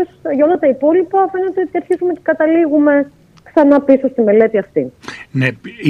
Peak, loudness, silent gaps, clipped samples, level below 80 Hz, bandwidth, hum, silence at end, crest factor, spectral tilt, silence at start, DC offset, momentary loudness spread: 0 dBFS; -14 LUFS; none; under 0.1%; -56 dBFS; 6.8 kHz; none; 0 s; 14 dB; -8 dB/octave; 0 s; under 0.1%; 9 LU